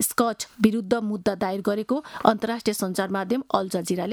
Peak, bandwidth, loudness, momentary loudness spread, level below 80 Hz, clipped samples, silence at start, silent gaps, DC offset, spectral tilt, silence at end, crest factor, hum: -2 dBFS; over 20 kHz; -25 LUFS; 4 LU; -60 dBFS; under 0.1%; 0 s; none; under 0.1%; -4.5 dB/octave; 0 s; 22 dB; none